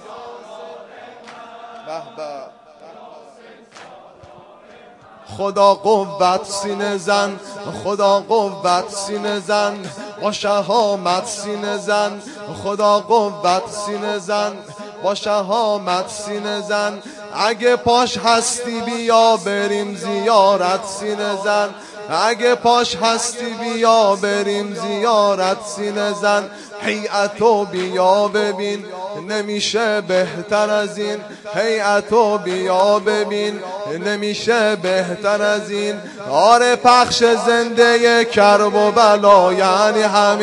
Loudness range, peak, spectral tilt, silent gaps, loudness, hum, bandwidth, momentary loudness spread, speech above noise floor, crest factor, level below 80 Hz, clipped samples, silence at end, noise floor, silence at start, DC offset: 7 LU; 0 dBFS; -3 dB/octave; none; -17 LUFS; none; 11.5 kHz; 16 LU; 26 dB; 18 dB; -60 dBFS; under 0.1%; 0 s; -43 dBFS; 0 s; under 0.1%